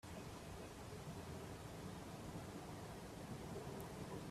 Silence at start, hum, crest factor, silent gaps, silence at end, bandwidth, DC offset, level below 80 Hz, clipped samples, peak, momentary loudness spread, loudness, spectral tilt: 0.05 s; none; 14 dB; none; 0 s; 15.5 kHz; under 0.1%; -64 dBFS; under 0.1%; -38 dBFS; 3 LU; -52 LUFS; -5.5 dB/octave